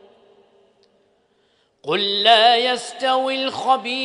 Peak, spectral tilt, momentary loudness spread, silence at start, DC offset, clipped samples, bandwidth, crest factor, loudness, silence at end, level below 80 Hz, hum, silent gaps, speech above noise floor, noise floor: 0 dBFS; -2 dB/octave; 10 LU; 1.85 s; under 0.1%; under 0.1%; 10.5 kHz; 20 dB; -17 LUFS; 0 s; -76 dBFS; none; none; 45 dB; -63 dBFS